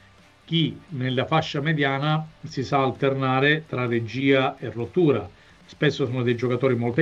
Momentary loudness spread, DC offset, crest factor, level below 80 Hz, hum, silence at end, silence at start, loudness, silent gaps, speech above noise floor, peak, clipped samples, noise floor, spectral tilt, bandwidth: 7 LU; under 0.1%; 16 dB; -60 dBFS; none; 0 s; 0.5 s; -23 LUFS; none; 29 dB; -6 dBFS; under 0.1%; -52 dBFS; -7 dB/octave; 7.6 kHz